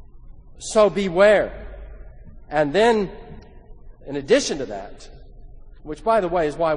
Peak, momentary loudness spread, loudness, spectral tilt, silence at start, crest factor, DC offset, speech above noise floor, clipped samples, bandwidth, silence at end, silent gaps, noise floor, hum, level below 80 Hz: -4 dBFS; 22 LU; -20 LUFS; -4.5 dB/octave; 0.15 s; 18 dB; under 0.1%; 22 dB; under 0.1%; 10 kHz; 0 s; none; -42 dBFS; none; -42 dBFS